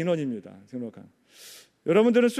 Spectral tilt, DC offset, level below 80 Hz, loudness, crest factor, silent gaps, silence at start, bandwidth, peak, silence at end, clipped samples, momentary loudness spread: -6 dB/octave; under 0.1%; -76 dBFS; -25 LUFS; 18 dB; none; 0 s; 14.5 kHz; -8 dBFS; 0 s; under 0.1%; 25 LU